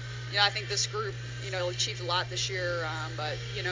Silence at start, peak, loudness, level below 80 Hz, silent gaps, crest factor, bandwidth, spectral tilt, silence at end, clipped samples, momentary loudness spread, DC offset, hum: 0 s; -10 dBFS; -30 LUFS; -54 dBFS; none; 22 dB; 7.6 kHz; -2.5 dB/octave; 0 s; under 0.1%; 9 LU; under 0.1%; none